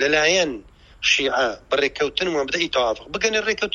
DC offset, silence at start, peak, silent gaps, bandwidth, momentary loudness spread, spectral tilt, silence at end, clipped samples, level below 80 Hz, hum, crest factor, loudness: under 0.1%; 0 s; -4 dBFS; none; 11 kHz; 6 LU; -2 dB/octave; 0.05 s; under 0.1%; -50 dBFS; none; 18 dB; -20 LUFS